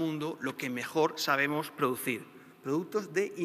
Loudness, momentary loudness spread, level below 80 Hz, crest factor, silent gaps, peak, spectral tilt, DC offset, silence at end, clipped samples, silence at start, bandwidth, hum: -32 LUFS; 8 LU; -80 dBFS; 20 dB; none; -12 dBFS; -4.5 dB/octave; under 0.1%; 0 s; under 0.1%; 0 s; 15.5 kHz; none